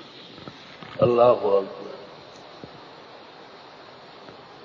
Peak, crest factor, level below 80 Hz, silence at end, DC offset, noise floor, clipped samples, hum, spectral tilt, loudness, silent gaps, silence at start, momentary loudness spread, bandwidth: -6 dBFS; 20 dB; -62 dBFS; 2 s; under 0.1%; -45 dBFS; under 0.1%; none; -7.5 dB/octave; -21 LUFS; none; 0.45 s; 26 LU; 7.2 kHz